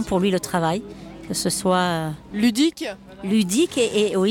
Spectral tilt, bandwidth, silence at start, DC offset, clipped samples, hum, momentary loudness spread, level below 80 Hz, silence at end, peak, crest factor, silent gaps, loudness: -4.5 dB/octave; 17.5 kHz; 0 s; under 0.1%; under 0.1%; none; 13 LU; -50 dBFS; 0 s; -8 dBFS; 14 dB; none; -22 LUFS